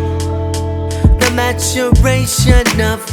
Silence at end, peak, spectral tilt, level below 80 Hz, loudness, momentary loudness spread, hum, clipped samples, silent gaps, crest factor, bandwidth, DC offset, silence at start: 0 s; 0 dBFS; -4.5 dB/octave; -18 dBFS; -13 LUFS; 8 LU; none; 0.2%; none; 12 dB; 19.5 kHz; under 0.1%; 0 s